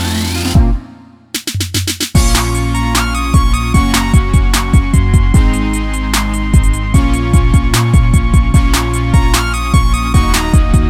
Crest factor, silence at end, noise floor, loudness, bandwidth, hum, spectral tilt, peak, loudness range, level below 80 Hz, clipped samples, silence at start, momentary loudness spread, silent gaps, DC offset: 10 dB; 0 s; -37 dBFS; -12 LUFS; 16.5 kHz; none; -5 dB/octave; 0 dBFS; 2 LU; -14 dBFS; under 0.1%; 0 s; 5 LU; none; under 0.1%